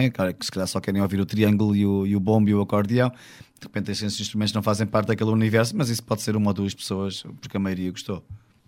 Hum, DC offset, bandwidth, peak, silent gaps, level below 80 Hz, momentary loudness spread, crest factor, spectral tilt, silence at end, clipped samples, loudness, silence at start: none; under 0.1%; 16.5 kHz; -6 dBFS; none; -58 dBFS; 11 LU; 18 dB; -6 dB/octave; 0.3 s; under 0.1%; -24 LUFS; 0 s